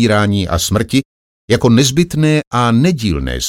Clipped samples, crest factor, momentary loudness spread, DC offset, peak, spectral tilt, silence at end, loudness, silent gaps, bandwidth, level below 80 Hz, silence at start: under 0.1%; 12 dB; 6 LU; under 0.1%; 0 dBFS; -5 dB/octave; 0 s; -13 LUFS; 1.05-1.48 s, 2.47-2.51 s; 17 kHz; -32 dBFS; 0 s